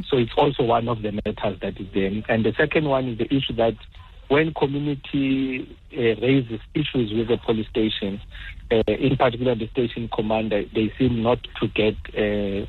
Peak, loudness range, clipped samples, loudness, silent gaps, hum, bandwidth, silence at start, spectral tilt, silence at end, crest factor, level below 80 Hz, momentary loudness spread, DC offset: -6 dBFS; 1 LU; under 0.1%; -23 LUFS; none; none; 4.4 kHz; 0 s; -9 dB/octave; 0 s; 16 dB; -42 dBFS; 7 LU; under 0.1%